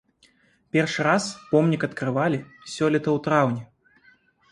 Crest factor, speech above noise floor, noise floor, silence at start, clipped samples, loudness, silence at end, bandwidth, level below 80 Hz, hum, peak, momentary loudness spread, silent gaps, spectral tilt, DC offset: 20 dB; 38 dB; -61 dBFS; 0.75 s; under 0.1%; -23 LUFS; 0.85 s; 11.5 kHz; -64 dBFS; none; -4 dBFS; 5 LU; none; -6 dB/octave; under 0.1%